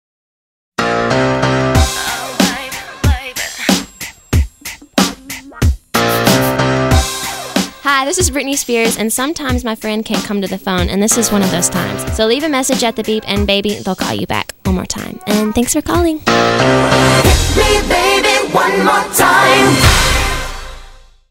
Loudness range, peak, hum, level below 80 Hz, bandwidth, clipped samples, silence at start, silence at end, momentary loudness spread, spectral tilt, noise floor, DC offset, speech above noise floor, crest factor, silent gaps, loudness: 6 LU; 0 dBFS; none; -24 dBFS; 16.5 kHz; under 0.1%; 0.8 s; 0.3 s; 9 LU; -4 dB/octave; -37 dBFS; under 0.1%; 24 dB; 14 dB; none; -13 LUFS